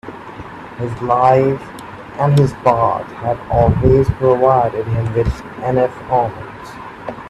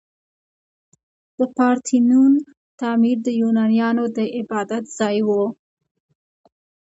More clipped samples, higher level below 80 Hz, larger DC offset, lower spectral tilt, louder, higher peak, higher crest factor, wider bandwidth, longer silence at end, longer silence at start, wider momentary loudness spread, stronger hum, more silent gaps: neither; first, -32 dBFS vs -72 dBFS; neither; first, -8.5 dB/octave vs -5.5 dB/octave; first, -16 LUFS vs -19 LUFS; first, 0 dBFS vs -4 dBFS; about the same, 16 dB vs 16 dB; first, 12 kHz vs 8 kHz; second, 0 s vs 1.4 s; second, 0.05 s vs 1.4 s; first, 20 LU vs 10 LU; neither; second, none vs 2.57-2.78 s